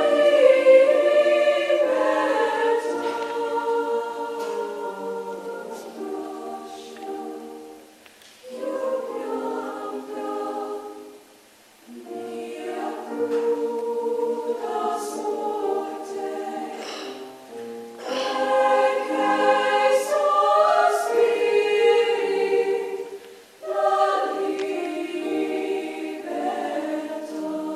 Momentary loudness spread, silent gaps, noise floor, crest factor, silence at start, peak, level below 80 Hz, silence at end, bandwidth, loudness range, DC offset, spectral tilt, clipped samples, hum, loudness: 17 LU; none; -52 dBFS; 20 dB; 0 s; -4 dBFS; -78 dBFS; 0 s; 14.5 kHz; 13 LU; under 0.1%; -3 dB/octave; under 0.1%; none; -23 LUFS